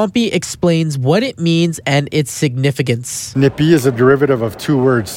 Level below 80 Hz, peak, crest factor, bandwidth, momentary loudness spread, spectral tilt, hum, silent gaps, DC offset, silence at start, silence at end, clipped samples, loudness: -48 dBFS; 0 dBFS; 14 dB; 16.5 kHz; 6 LU; -5.5 dB/octave; none; none; under 0.1%; 0 s; 0 s; under 0.1%; -15 LUFS